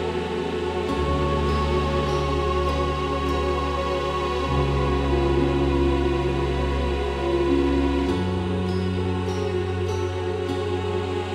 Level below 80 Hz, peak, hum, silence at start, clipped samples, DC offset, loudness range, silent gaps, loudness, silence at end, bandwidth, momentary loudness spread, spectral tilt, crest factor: -30 dBFS; -10 dBFS; none; 0 s; under 0.1%; under 0.1%; 2 LU; none; -24 LUFS; 0 s; 11.5 kHz; 5 LU; -7 dB/octave; 14 dB